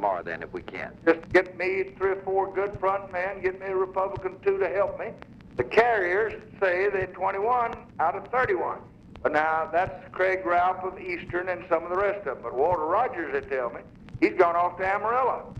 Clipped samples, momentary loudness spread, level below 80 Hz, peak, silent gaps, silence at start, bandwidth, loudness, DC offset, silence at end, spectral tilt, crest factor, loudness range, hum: under 0.1%; 10 LU; -54 dBFS; -8 dBFS; none; 0 s; 8 kHz; -26 LUFS; under 0.1%; 0 s; -7 dB/octave; 18 dB; 2 LU; none